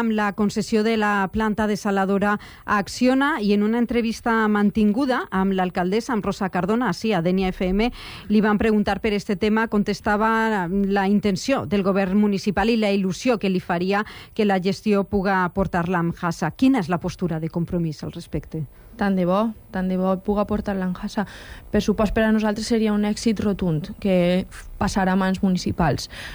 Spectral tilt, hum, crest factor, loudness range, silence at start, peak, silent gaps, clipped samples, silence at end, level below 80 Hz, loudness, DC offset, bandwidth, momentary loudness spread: -6.5 dB/octave; none; 14 dB; 4 LU; 0 s; -8 dBFS; none; under 0.1%; 0 s; -42 dBFS; -22 LUFS; under 0.1%; 19.5 kHz; 7 LU